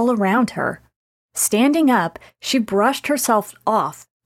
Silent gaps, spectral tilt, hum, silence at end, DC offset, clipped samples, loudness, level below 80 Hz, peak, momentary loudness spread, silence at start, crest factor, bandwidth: 0.96-1.29 s; -3.5 dB/octave; none; 0.25 s; under 0.1%; under 0.1%; -19 LUFS; -60 dBFS; -4 dBFS; 11 LU; 0 s; 16 dB; 17 kHz